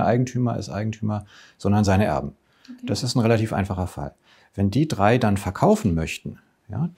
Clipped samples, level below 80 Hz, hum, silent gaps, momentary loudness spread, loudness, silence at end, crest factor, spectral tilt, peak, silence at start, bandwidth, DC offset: under 0.1%; -46 dBFS; none; none; 16 LU; -23 LUFS; 0.05 s; 20 dB; -6.5 dB/octave; -2 dBFS; 0 s; 16 kHz; under 0.1%